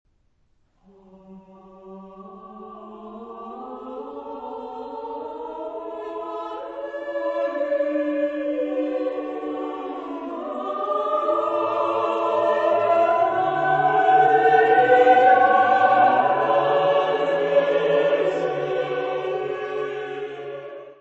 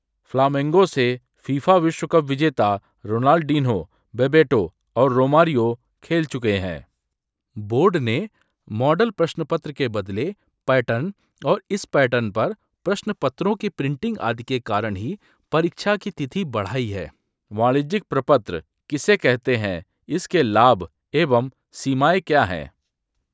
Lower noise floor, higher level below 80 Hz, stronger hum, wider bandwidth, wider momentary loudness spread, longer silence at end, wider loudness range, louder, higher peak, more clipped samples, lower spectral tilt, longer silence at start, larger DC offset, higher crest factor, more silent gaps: second, -64 dBFS vs -81 dBFS; second, -66 dBFS vs -52 dBFS; neither; about the same, 7.8 kHz vs 8 kHz; first, 20 LU vs 13 LU; second, 0.05 s vs 0.65 s; first, 19 LU vs 5 LU; about the same, -21 LUFS vs -21 LUFS; second, -4 dBFS vs 0 dBFS; neither; about the same, -6 dB/octave vs -6.5 dB/octave; first, 1.3 s vs 0.35 s; neither; about the same, 18 dB vs 20 dB; neither